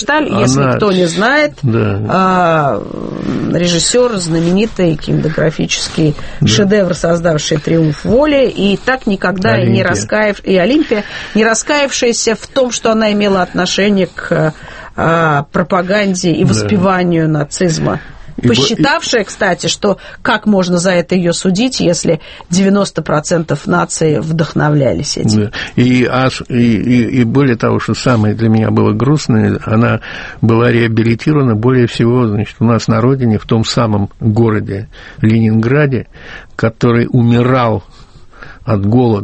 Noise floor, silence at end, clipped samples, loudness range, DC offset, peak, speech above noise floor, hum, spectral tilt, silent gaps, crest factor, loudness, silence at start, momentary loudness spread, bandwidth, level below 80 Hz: -34 dBFS; 0 s; under 0.1%; 2 LU; under 0.1%; 0 dBFS; 22 dB; none; -5.5 dB/octave; none; 12 dB; -12 LUFS; 0 s; 5 LU; 8.8 kHz; -36 dBFS